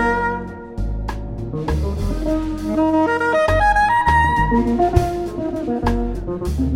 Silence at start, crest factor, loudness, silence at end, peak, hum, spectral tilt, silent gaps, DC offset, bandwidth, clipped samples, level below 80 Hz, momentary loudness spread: 0 s; 18 dB; -19 LUFS; 0 s; -2 dBFS; none; -7 dB/octave; none; under 0.1%; 15.5 kHz; under 0.1%; -26 dBFS; 12 LU